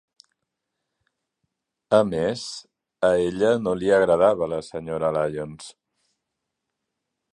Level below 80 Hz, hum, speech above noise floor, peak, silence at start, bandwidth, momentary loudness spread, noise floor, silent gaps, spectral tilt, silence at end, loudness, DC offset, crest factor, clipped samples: -56 dBFS; none; 60 dB; -2 dBFS; 1.9 s; 11 kHz; 16 LU; -82 dBFS; none; -5.5 dB/octave; 1.65 s; -22 LUFS; under 0.1%; 22 dB; under 0.1%